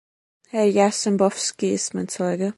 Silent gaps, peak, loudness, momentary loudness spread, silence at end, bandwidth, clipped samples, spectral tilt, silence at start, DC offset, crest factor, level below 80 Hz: none; -4 dBFS; -22 LUFS; 8 LU; 0.05 s; 11.5 kHz; under 0.1%; -4.5 dB/octave; 0.55 s; under 0.1%; 18 dB; -66 dBFS